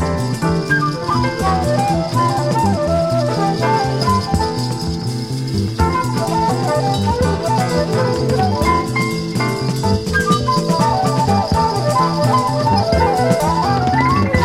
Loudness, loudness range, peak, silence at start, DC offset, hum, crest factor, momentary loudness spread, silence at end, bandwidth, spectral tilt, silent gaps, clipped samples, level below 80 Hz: -16 LUFS; 3 LU; 0 dBFS; 0 s; under 0.1%; none; 14 dB; 4 LU; 0 s; 15.5 kHz; -6 dB/octave; none; under 0.1%; -32 dBFS